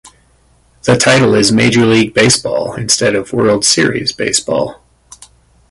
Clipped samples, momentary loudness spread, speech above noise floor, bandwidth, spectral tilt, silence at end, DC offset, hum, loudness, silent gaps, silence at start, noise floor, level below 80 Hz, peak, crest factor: under 0.1%; 9 LU; 40 dB; 11.5 kHz; -3.5 dB/octave; 1 s; under 0.1%; none; -11 LUFS; none; 0.05 s; -51 dBFS; -44 dBFS; 0 dBFS; 12 dB